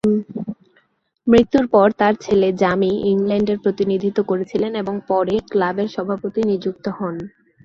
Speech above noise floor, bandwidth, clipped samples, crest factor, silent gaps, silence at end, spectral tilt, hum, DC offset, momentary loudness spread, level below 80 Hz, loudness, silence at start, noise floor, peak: 44 dB; 7.4 kHz; under 0.1%; 18 dB; none; 0.35 s; -7.5 dB/octave; none; under 0.1%; 12 LU; -50 dBFS; -19 LUFS; 0.05 s; -61 dBFS; -2 dBFS